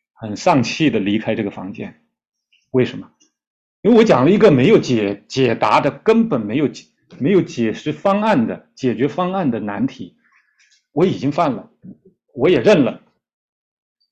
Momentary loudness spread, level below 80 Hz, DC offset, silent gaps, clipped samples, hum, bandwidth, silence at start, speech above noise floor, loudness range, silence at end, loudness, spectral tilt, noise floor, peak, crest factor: 14 LU; -54 dBFS; under 0.1%; 3.47-3.83 s; under 0.1%; none; 8.2 kHz; 0.2 s; 42 dB; 7 LU; 1.15 s; -17 LUFS; -6.5 dB/octave; -58 dBFS; -2 dBFS; 16 dB